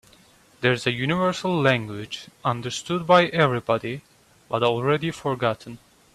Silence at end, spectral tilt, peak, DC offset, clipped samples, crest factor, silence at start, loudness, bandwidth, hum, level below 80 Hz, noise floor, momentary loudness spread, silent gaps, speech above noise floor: 0.4 s; -5.5 dB/octave; -4 dBFS; under 0.1%; under 0.1%; 20 dB; 0.6 s; -23 LUFS; 13.5 kHz; none; -58 dBFS; -55 dBFS; 15 LU; none; 32 dB